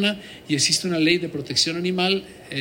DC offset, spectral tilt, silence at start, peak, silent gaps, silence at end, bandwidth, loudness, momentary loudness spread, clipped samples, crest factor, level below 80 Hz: under 0.1%; -3 dB/octave; 0 s; -6 dBFS; none; 0 s; 16.5 kHz; -21 LUFS; 8 LU; under 0.1%; 18 dB; -60 dBFS